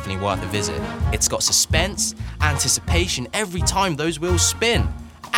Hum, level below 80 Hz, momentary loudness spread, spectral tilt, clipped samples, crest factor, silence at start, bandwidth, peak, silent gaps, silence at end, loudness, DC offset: none; -32 dBFS; 8 LU; -3 dB/octave; under 0.1%; 20 dB; 0 s; 18.5 kHz; -2 dBFS; none; 0 s; -20 LUFS; under 0.1%